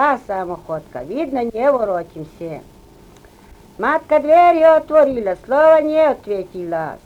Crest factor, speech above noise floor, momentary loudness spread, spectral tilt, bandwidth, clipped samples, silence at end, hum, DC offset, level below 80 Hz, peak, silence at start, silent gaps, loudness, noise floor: 14 dB; 28 dB; 17 LU; -6.5 dB/octave; 8.4 kHz; under 0.1%; 0.1 s; none; under 0.1%; -50 dBFS; -2 dBFS; 0 s; none; -16 LUFS; -45 dBFS